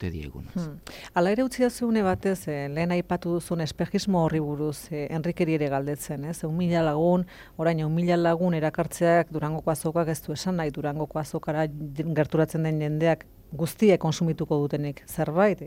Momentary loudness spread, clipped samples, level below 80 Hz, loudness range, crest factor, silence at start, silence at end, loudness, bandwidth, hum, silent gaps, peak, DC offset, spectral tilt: 9 LU; under 0.1%; -52 dBFS; 3 LU; 18 dB; 0 s; 0 s; -26 LUFS; 16.5 kHz; none; none; -8 dBFS; under 0.1%; -6.5 dB/octave